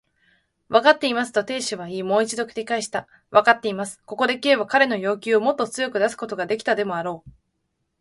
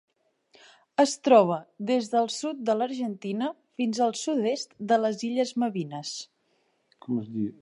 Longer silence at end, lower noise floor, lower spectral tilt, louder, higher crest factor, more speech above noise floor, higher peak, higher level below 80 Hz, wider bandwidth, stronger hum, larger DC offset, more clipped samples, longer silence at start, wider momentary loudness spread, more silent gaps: first, 0.7 s vs 0.1 s; first, -75 dBFS vs -71 dBFS; about the same, -3.5 dB/octave vs -4.5 dB/octave; first, -22 LUFS vs -27 LUFS; about the same, 22 dB vs 20 dB; first, 53 dB vs 45 dB; first, -2 dBFS vs -6 dBFS; first, -66 dBFS vs -80 dBFS; about the same, 11.5 kHz vs 11 kHz; neither; neither; neither; second, 0.7 s vs 1 s; about the same, 12 LU vs 13 LU; neither